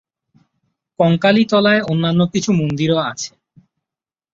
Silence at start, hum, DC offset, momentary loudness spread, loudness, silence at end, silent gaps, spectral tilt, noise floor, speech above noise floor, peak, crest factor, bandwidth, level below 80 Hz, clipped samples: 1 s; none; under 0.1%; 8 LU; -16 LUFS; 1.05 s; none; -5.5 dB/octave; -88 dBFS; 73 dB; -2 dBFS; 16 dB; 7.8 kHz; -54 dBFS; under 0.1%